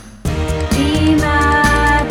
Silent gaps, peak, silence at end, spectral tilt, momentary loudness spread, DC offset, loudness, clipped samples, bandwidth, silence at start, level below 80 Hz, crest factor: none; 0 dBFS; 0 s; -5.5 dB/octave; 8 LU; under 0.1%; -14 LUFS; under 0.1%; 17.5 kHz; 0 s; -22 dBFS; 14 dB